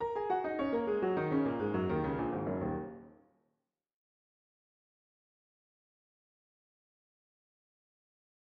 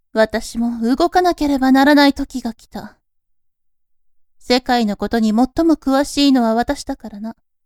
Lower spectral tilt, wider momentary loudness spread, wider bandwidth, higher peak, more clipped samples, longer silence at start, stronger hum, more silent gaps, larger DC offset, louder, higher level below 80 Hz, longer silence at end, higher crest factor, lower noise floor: first, -10 dB/octave vs -4.5 dB/octave; second, 6 LU vs 16 LU; second, 5.6 kHz vs 15 kHz; second, -20 dBFS vs 0 dBFS; neither; second, 0 s vs 0.15 s; neither; neither; neither; second, -34 LUFS vs -16 LUFS; second, -62 dBFS vs -40 dBFS; first, 5.35 s vs 0.35 s; about the same, 18 dB vs 16 dB; first, -85 dBFS vs -63 dBFS